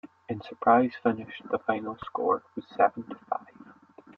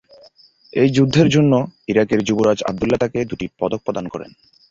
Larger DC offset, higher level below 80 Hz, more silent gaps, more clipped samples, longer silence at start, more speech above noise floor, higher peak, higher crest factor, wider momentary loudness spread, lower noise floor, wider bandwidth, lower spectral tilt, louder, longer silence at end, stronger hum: neither; second, -70 dBFS vs -48 dBFS; neither; neither; second, 0.05 s vs 0.75 s; second, 25 dB vs 32 dB; second, -8 dBFS vs -2 dBFS; first, 22 dB vs 16 dB; first, 15 LU vs 12 LU; about the same, -53 dBFS vs -50 dBFS; second, 5.6 kHz vs 7.8 kHz; first, -8.5 dB/octave vs -6.5 dB/octave; second, -28 LUFS vs -18 LUFS; about the same, 0.45 s vs 0.45 s; neither